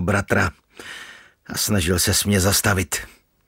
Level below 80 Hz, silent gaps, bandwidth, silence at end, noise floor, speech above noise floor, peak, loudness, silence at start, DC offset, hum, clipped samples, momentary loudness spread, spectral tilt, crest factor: -40 dBFS; none; 16.5 kHz; 0.4 s; -43 dBFS; 23 dB; -2 dBFS; -20 LUFS; 0 s; under 0.1%; none; under 0.1%; 20 LU; -3.5 dB/octave; 18 dB